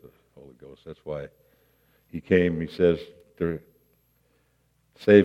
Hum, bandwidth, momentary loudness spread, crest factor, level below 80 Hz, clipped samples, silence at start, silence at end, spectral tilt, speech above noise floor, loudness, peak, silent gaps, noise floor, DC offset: none; 6.2 kHz; 23 LU; 24 dB; -60 dBFS; under 0.1%; 0.85 s; 0 s; -8.5 dB/octave; 45 dB; -25 LUFS; -4 dBFS; none; -68 dBFS; under 0.1%